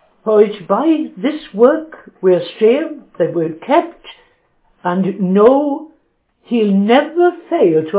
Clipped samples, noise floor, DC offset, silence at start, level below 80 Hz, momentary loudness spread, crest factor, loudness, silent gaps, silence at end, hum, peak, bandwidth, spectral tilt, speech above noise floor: under 0.1%; -60 dBFS; under 0.1%; 0.25 s; -62 dBFS; 10 LU; 14 dB; -15 LUFS; none; 0 s; none; 0 dBFS; 4 kHz; -11 dB/octave; 46 dB